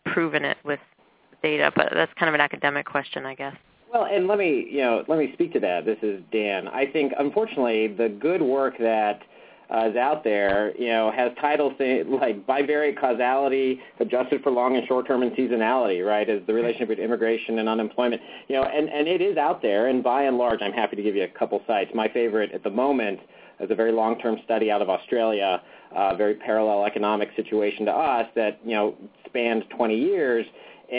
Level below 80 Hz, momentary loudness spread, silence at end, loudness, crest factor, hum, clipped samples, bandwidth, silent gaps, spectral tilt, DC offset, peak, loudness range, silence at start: -64 dBFS; 5 LU; 0 s; -24 LUFS; 24 dB; none; under 0.1%; 4 kHz; none; -9 dB/octave; under 0.1%; 0 dBFS; 2 LU; 0.05 s